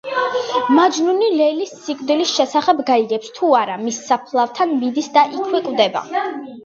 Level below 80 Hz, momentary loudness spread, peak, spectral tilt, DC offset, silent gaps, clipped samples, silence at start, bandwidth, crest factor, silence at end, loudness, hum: -70 dBFS; 8 LU; 0 dBFS; -3 dB/octave; under 0.1%; none; under 0.1%; 0.05 s; 7.8 kHz; 16 dB; 0.05 s; -17 LUFS; none